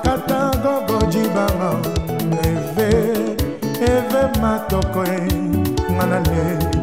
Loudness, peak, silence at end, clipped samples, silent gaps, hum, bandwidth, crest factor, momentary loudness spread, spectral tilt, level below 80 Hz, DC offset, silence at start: -19 LUFS; -4 dBFS; 0 s; under 0.1%; none; none; 16 kHz; 14 dB; 4 LU; -6.5 dB/octave; -30 dBFS; 0.6%; 0 s